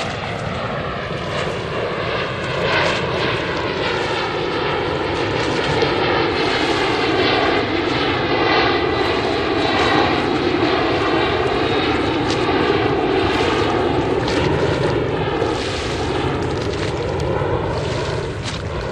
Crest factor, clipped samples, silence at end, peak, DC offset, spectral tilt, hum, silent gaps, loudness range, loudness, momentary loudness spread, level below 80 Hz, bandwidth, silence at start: 16 dB; under 0.1%; 0 s; -2 dBFS; under 0.1%; -5.5 dB/octave; none; none; 4 LU; -19 LUFS; 7 LU; -36 dBFS; 10.5 kHz; 0 s